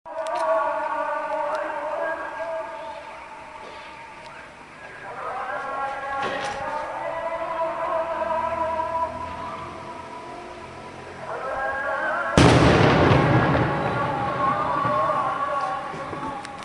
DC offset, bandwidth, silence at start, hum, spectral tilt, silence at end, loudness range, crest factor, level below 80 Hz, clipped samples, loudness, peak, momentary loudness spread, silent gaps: under 0.1%; 11.5 kHz; 0.05 s; none; -6 dB/octave; 0 s; 13 LU; 24 dB; -44 dBFS; under 0.1%; -24 LUFS; 0 dBFS; 21 LU; none